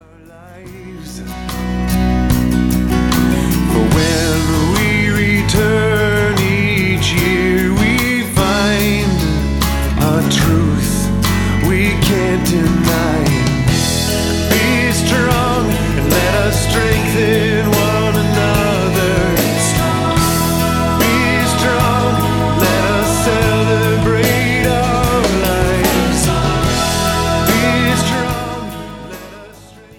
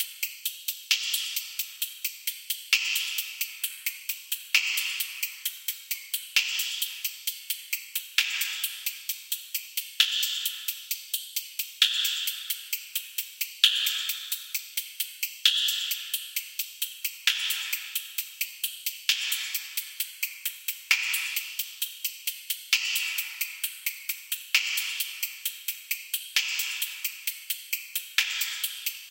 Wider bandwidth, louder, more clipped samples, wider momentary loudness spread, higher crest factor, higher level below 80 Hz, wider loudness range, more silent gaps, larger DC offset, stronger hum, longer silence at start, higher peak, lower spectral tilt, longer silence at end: first, 19.5 kHz vs 17.5 kHz; first, -14 LUFS vs -28 LUFS; neither; second, 3 LU vs 9 LU; second, 14 dB vs 28 dB; first, -24 dBFS vs under -90 dBFS; about the same, 1 LU vs 3 LU; neither; neither; neither; first, 0.35 s vs 0 s; about the same, 0 dBFS vs -2 dBFS; first, -5 dB/octave vs 10.5 dB/octave; first, 0.3 s vs 0 s